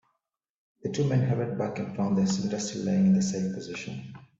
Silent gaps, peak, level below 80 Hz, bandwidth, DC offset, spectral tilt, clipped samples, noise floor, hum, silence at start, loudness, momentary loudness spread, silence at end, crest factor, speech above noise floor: none; -14 dBFS; -64 dBFS; 7.8 kHz; under 0.1%; -6.5 dB/octave; under 0.1%; -83 dBFS; none; 0.85 s; -28 LUFS; 13 LU; 0.2 s; 14 dB; 55 dB